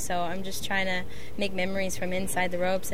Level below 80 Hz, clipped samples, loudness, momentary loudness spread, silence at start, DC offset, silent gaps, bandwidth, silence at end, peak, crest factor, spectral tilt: -50 dBFS; under 0.1%; -30 LUFS; 6 LU; 0 s; 4%; none; 16 kHz; 0 s; -12 dBFS; 16 dB; -3.5 dB/octave